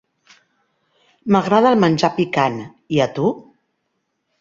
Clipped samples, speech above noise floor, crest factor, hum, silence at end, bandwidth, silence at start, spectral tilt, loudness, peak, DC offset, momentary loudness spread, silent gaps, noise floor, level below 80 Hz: under 0.1%; 56 dB; 18 dB; none; 1 s; 7.6 kHz; 1.25 s; -6.5 dB/octave; -17 LUFS; -2 dBFS; under 0.1%; 14 LU; none; -72 dBFS; -58 dBFS